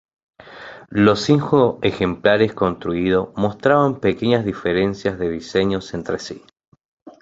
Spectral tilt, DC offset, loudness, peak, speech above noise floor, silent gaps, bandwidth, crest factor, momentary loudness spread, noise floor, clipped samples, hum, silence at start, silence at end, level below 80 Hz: -6.5 dB/octave; under 0.1%; -19 LUFS; -2 dBFS; 21 dB; 6.68-6.72 s, 6.85-7.06 s; 8 kHz; 18 dB; 11 LU; -39 dBFS; under 0.1%; none; 0.45 s; 0.1 s; -46 dBFS